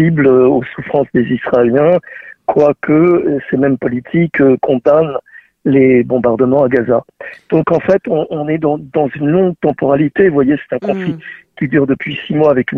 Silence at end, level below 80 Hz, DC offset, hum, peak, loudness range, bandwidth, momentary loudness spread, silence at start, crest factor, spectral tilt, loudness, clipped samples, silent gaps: 0 s; -48 dBFS; under 0.1%; none; 0 dBFS; 2 LU; 6 kHz; 8 LU; 0 s; 12 dB; -9.5 dB/octave; -13 LUFS; under 0.1%; none